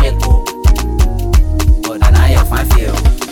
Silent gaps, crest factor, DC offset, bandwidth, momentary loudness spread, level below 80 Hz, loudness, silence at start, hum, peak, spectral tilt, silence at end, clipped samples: none; 10 dB; 1%; 18 kHz; 4 LU; -10 dBFS; -13 LUFS; 0 s; none; 0 dBFS; -5.5 dB/octave; 0 s; under 0.1%